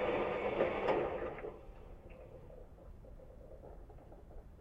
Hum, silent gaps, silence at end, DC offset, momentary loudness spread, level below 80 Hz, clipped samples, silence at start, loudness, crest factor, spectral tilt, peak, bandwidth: none; none; 0 s; under 0.1%; 22 LU; -56 dBFS; under 0.1%; 0 s; -37 LUFS; 22 dB; -7.5 dB/octave; -20 dBFS; 8 kHz